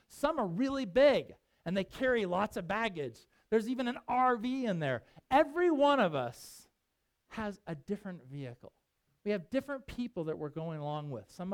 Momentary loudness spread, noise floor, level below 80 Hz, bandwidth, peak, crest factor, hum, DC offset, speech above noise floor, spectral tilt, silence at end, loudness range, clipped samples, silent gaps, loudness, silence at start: 17 LU; -82 dBFS; -62 dBFS; 17 kHz; -14 dBFS; 20 dB; none; under 0.1%; 49 dB; -6 dB/octave; 0 s; 10 LU; under 0.1%; none; -33 LUFS; 0.1 s